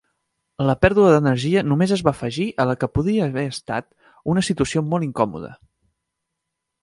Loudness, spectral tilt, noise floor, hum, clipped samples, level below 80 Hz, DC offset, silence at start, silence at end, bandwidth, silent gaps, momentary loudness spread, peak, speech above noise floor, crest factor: -20 LUFS; -6.5 dB/octave; -80 dBFS; none; under 0.1%; -44 dBFS; under 0.1%; 0.6 s; 1.3 s; 11.5 kHz; none; 12 LU; 0 dBFS; 61 dB; 20 dB